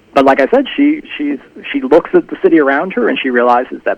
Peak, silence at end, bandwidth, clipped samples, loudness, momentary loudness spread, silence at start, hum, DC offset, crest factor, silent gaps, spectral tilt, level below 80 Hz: 0 dBFS; 0.05 s; 8 kHz; 0.3%; -12 LUFS; 10 LU; 0.15 s; none; under 0.1%; 12 dB; none; -6.5 dB/octave; -50 dBFS